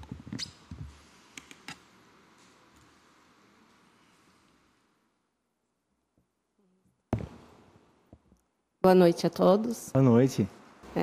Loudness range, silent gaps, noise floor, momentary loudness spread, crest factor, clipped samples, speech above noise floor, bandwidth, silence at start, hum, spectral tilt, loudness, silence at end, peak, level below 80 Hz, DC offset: 25 LU; none; -79 dBFS; 26 LU; 22 dB; under 0.1%; 56 dB; 15.5 kHz; 0 s; none; -7 dB/octave; -26 LUFS; 0 s; -10 dBFS; -58 dBFS; under 0.1%